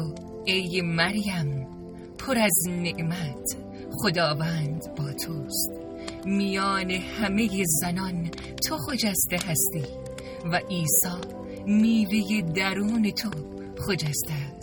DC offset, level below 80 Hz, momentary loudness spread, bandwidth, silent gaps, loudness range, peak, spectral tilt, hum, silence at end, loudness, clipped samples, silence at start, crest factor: under 0.1%; -50 dBFS; 13 LU; 19.5 kHz; none; 3 LU; -6 dBFS; -4 dB/octave; none; 0 s; -26 LUFS; under 0.1%; 0 s; 20 dB